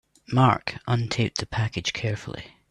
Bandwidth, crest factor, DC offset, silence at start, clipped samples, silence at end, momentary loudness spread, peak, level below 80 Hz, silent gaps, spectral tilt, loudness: 10.5 kHz; 20 dB; under 0.1%; 0.3 s; under 0.1%; 0.25 s; 12 LU; -4 dBFS; -52 dBFS; none; -5.5 dB/octave; -25 LUFS